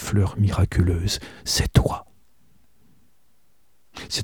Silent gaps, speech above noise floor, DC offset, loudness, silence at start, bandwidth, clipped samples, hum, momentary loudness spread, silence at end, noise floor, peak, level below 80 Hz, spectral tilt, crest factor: none; 46 dB; 0.3%; -23 LUFS; 0 s; 18 kHz; under 0.1%; none; 13 LU; 0 s; -67 dBFS; -2 dBFS; -34 dBFS; -5 dB/octave; 22 dB